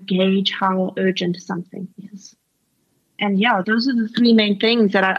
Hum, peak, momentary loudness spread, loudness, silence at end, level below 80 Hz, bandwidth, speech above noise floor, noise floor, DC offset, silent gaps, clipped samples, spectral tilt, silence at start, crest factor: none; -4 dBFS; 15 LU; -18 LUFS; 0 s; -72 dBFS; 7.2 kHz; 50 dB; -68 dBFS; under 0.1%; none; under 0.1%; -6 dB/octave; 0 s; 14 dB